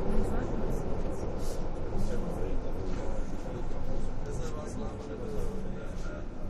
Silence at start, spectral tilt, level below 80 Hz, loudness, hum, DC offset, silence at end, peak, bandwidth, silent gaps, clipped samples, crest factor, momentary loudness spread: 0 s; -7 dB/octave; -32 dBFS; -37 LUFS; none; under 0.1%; 0 s; -14 dBFS; 10.5 kHz; none; under 0.1%; 16 dB; 5 LU